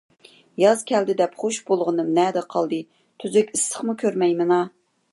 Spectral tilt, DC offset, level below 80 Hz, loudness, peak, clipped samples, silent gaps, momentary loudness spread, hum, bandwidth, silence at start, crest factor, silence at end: -4.5 dB/octave; under 0.1%; -74 dBFS; -22 LUFS; -4 dBFS; under 0.1%; none; 8 LU; none; 11.5 kHz; 0.6 s; 18 dB; 0.45 s